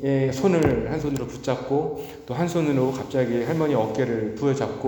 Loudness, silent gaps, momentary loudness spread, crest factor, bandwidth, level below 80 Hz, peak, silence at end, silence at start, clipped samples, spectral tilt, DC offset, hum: -24 LUFS; none; 7 LU; 16 dB; over 20 kHz; -48 dBFS; -6 dBFS; 0 s; 0 s; under 0.1%; -7 dB/octave; under 0.1%; none